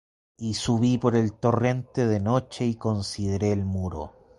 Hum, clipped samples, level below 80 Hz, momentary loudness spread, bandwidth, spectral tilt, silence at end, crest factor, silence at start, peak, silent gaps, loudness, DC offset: none; under 0.1%; -46 dBFS; 8 LU; 11.5 kHz; -6.5 dB/octave; 0.3 s; 18 dB; 0.4 s; -8 dBFS; none; -26 LUFS; under 0.1%